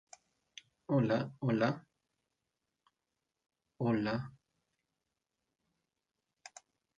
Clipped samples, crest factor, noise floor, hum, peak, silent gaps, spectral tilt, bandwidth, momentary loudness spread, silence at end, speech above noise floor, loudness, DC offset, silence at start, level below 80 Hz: under 0.1%; 20 dB; -88 dBFS; none; -18 dBFS; none; -7.5 dB/octave; 9.2 kHz; 23 LU; 2.65 s; 56 dB; -34 LUFS; under 0.1%; 0.9 s; -74 dBFS